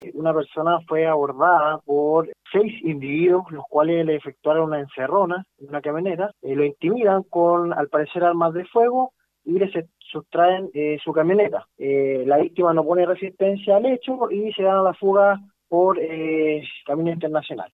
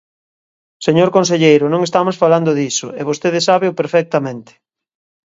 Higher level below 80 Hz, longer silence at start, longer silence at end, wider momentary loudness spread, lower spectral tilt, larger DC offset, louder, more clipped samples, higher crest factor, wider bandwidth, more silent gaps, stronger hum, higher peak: second, -70 dBFS vs -62 dBFS; second, 0 s vs 0.8 s; second, 0.05 s vs 0.85 s; about the same, 8 LU vs 9 LU; first, -9.5 dB/octave vs -5 dB/octave; neither; second, -21 LUFS vs -14 LUFS; neither; about the same, 16 dB vs 16 dB; second, 4.6 kHz vs 8 kHz; neither; neither; second, -6 dBFS vs 0 dBFS